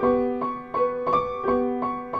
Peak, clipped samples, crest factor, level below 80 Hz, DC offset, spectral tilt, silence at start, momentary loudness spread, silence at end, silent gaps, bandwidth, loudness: -10 dBFS; under 0.1%; 14 dB; -52 dBFS; under 0.1%; -8.5 dB/octave; 0 s; 5 LU; 0 s; none; 5 kHz; -25 LUFS